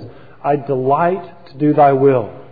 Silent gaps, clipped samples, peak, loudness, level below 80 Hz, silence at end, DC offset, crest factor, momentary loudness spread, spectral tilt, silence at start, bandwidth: none; under 0.1%; -2 dBFS; -15 LUFS; -58 dBFS; 0.1 s; 0.8%; 14 dB; 9 LU; -12 dB/octave; 0 s; 4.9 kHz